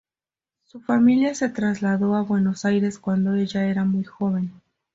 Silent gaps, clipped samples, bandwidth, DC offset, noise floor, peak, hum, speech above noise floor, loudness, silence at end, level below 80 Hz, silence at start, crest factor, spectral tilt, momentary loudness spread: none; under 0.1%; 7.8 kHz; under 0.1%; under -90 dBFS; -8 dBFS; none; over 69 dB; -22 LUFS; 0.45 s; -62 dBFS; 0.75 s; 14 dB; -7 dB/octave; 7 LU